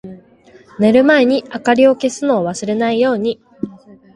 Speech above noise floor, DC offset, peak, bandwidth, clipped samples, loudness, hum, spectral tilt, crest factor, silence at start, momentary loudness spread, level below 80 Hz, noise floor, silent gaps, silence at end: 32 dB; under 0.1%; 0 dBFS; 11 kHz; under 0.1%; -14 LUFS; none; -5 dB/octave; 16 dB; 0.05 s; 15 LU; -56 dBFS; -46 dBFS; none; 0.4 s